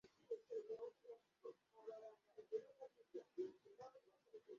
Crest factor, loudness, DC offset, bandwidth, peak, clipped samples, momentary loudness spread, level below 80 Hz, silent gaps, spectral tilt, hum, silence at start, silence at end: 20 dB; -56 LUFS; under 0.1%; 7.2 kHz; -36 dBFS; under 0.1%; 12 LU; under -90 dBFS; none; -5 dB/octave; none; 0.05 s; 0 s